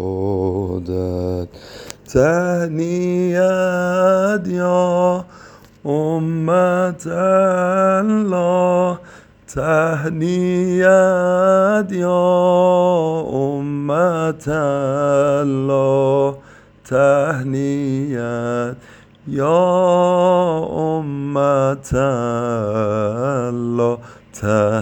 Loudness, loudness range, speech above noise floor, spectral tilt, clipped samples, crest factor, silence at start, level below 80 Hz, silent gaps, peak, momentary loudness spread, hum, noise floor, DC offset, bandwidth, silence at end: -17 LUFS; 4 LU; 26 dB; -7 dB/octave; under 0.1%; 16 dB; 0 s; -46 dBFS; none; 0 dBFS; 9 LU; none; -42 dBFS; under 0.1%; 16.5 kHz; 0 s